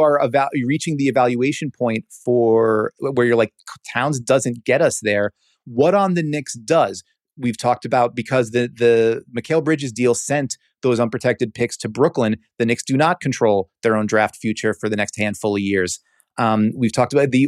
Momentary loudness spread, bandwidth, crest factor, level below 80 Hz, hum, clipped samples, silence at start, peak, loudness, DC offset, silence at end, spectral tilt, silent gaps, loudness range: 7 LU; 13.5 kHz; 14 dB; -62 dBFS; none; under 0.1%; 0 s; -4 dBFS; -19 LUFS; under 0.1%; 0 s; -5.5 dB/octave; none; 2 LU